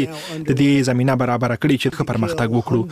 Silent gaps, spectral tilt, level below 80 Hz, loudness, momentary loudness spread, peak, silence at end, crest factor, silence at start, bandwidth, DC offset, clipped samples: none; -6.5 dB/octave; -48 dBFS; -19 LUFS; 6 LU; -4 dBFS; 0 s; 14 dB; 0 s; 15 kHz; under 0.1%; under 0.1%